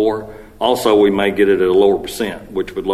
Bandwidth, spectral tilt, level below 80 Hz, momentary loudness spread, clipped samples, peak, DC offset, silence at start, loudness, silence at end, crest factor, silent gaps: 15 kHz; -5 dB/octave; -42 dBFS; 11 LU; under 0.1%; 0 dBFS; under 0.1%; 0 s; -15 LUFS; 0 s; 16 dB; none